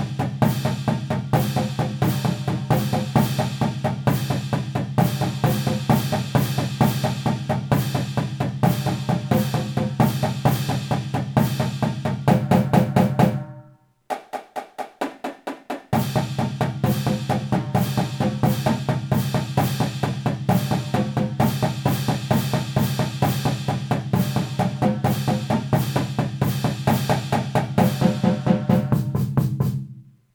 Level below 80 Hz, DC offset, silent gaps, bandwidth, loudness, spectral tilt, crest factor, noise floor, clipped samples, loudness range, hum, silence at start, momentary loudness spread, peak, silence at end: -48 dBFS; under 0.1%; none; over 20 kHz; -22 LUFS; -6.5 dB/octave; 18 dB; -51 dBFS; under 0.1%; 3 LU; none; 0 s; 5 LU; -2 dBFS; 0.3 s